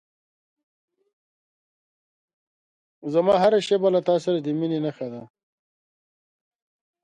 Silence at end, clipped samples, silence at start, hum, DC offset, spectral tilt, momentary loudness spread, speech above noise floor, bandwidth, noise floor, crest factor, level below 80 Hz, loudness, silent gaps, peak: 1.8 s; under 0.1%; 3.05 s; none; under 0.1%; -6.5 dB/octave; 16 LU; over 68 dB; 10.5 kHz; under -90 dBFS; 20 dB; -70 dBFS; -22 LUFS; none; -6 dBFS